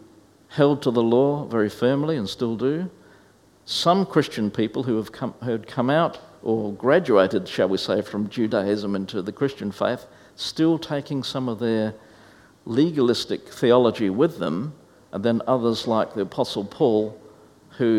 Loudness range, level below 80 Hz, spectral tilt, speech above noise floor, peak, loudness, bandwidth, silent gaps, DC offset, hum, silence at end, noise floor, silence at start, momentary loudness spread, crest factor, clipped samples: 3 LU; -62 dBFS; -6.5 dB/octave; 33 dB; -4 dBFS; -23 LUFS; 15.5 kHz; none; under 0.1%; none; 0 s; -55 dBFS; 0.5 s; 10 LU; 20 dB; under 0.1%